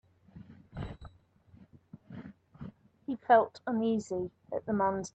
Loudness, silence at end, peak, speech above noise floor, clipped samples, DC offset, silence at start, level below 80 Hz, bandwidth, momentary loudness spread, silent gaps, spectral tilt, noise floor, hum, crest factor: -31 LUFS; 0.05 s; -12 dBFS; 32 dB; under 0.1%; under 0.1%; 0.35 s; -60 dBFS; 8.6 kHz; 25 LU; none; -6.5 dB/octave; -61 dBFS; none; 22 dB